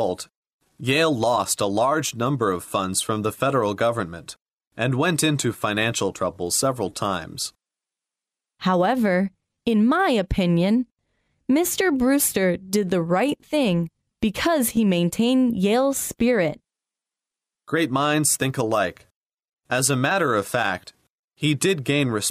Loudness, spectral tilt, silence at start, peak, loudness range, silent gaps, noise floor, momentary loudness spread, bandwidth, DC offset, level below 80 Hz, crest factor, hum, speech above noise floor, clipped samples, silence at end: -22 LUFS; -4.5 dB/octave; 0 s; -6 dBFS; 3 LU; 0.36-0.43 s, 0.53-0.59 s, 4.53-4.57 s, 4.67-4.71 s, 19.16-19.30 s, 19.53-19.57 s, 21.10-21.28 s; -89 dBFS; 8 LU; 15.5 kHz; under 0.1%; -48 dBFS; 16 dB; none; 67 dB; under 0.1%; 0 s